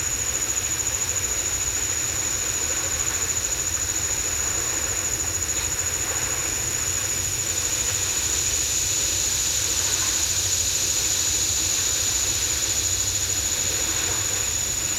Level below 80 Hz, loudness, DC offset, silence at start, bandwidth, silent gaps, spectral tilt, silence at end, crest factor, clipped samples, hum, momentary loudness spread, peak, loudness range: -40 dBFS; -21 LUFS; under 0.1%; 0 s; 16 kHz; none; -0.5 dB/octave; 0 s; 16 dB; under 0.1%; none; 3 LU; -10 dBFS; 2 LU